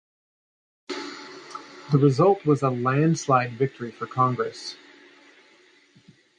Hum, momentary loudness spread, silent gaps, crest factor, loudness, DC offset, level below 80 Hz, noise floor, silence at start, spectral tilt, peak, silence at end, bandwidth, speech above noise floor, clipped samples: none; 20 LU; none; 18 dB; -23 LUFS; under 0.1%; -66 dBFS; -57 dBFS; 0.9 s; -7 dB/octave; -6 dBFS; 1.65 s; 9.8 kHz; 35 dB; under 0.1%